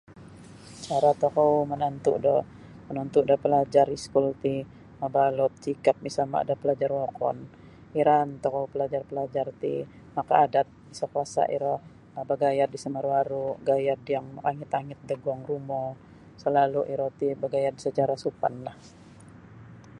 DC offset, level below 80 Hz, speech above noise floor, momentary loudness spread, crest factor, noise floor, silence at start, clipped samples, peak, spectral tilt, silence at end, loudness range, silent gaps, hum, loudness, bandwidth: under 0.1%; -62 dBFS; 23 dB; 12 LU; 22 dB; -49 dBFS; 0.1 s; under 0.1%; -6 dBFS; -6.5 dB/octave; 0 s; 4 LU; none; none; -27 LUFS; 11 kHz